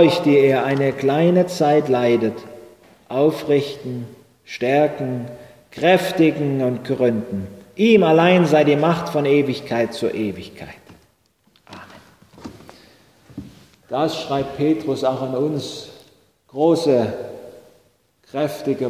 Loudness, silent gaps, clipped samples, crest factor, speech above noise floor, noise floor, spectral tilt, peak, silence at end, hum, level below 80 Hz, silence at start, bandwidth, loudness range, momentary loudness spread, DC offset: -18 LUFS; none; under 0.1%; 18 dB; 43 dB; -61 dBFS; -6.5 dB/octave; -2 dBFS; 0 s; none; -56 dBFS; 0 s; 16 kHz; 11 LU; 24 LU; under 0.1%